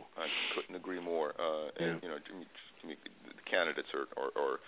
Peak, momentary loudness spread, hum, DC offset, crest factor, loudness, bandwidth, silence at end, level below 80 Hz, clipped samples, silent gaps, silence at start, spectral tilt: -14 dBFS; 16 LU; none; under 0.1%; 24 dB; -37 LUFS; 4 kHz; 0 s; -80 dBFS; under 0.1%; none; 0 s; -1.5 dB/octave